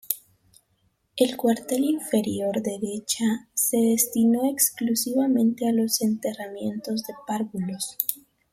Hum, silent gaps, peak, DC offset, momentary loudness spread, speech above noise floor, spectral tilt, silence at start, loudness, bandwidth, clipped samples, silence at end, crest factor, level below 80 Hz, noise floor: none; none; -4 dBFS; under 0.1%; 10 LU; 45 dB; -4 dB/octave; 0.1 s; -24 LUFS; 16.5 kHz; under 0.1%; 0.35 s; 22 dB; -68 dBFS; -69 dBFS